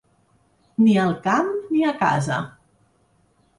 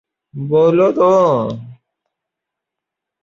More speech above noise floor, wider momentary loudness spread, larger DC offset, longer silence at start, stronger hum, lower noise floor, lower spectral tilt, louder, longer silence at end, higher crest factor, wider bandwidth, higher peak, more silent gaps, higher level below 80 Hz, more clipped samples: second, 43 dB vs 69 dB; second, 11 LU vs 18 LU; neither; first, 0.8 s vs 0.35 s; neither; second, -62 dBFS vs -82 dBFS; second, -6.5 dB/octave vs -8 dB/octave; second, -21 LUFS vs -14 LUFS; second, 1.1 s vs 1.5 s; about the same, 16 dB vs 14 dB; first, 11.5 kHz vs 7.4 kHz; second, -6 dBFS vs -2 dBFS; neither; about the same, -62 dBFS vs -58 dBFS; neither